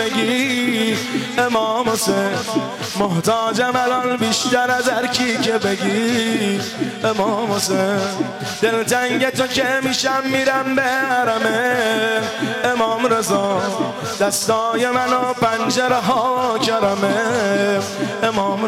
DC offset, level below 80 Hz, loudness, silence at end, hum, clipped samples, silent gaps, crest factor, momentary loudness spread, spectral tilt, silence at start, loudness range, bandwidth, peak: under 0.1%; -58 dBFS; -18 LUFS; 0 s; none; under 0.1%; none; 12 dB; 4 LU; -3.5 dB/octave; 0 s; 1 LU; 16.5 kHz; -8 dBFS